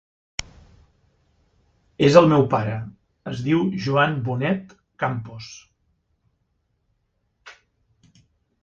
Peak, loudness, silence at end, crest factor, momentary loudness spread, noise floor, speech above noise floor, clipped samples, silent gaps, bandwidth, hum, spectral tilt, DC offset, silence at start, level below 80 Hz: 0 dBFS; -21 LUFS; 1.1 s; 24 dB; 23 LU; -71 dBFS; 51 dB; under 0.1%; none; 8 kHz; none; -6.5 dB/octave; under 0.1%; 0.4 s; -56 dBFS